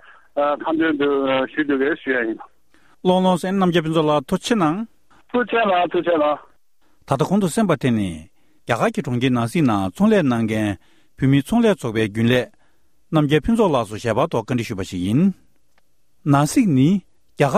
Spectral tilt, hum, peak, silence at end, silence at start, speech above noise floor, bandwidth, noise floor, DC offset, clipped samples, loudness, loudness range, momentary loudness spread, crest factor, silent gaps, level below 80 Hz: -6.5 dB/octave; none; -2 dBFS; 0 s; 0.35 s; 47 dB; 15 kHz; -65 dBFS; 0.2%; under 0.1%; -19 LUFS; 2 LU; 8 LU; 18 dB; none; -48 dBFS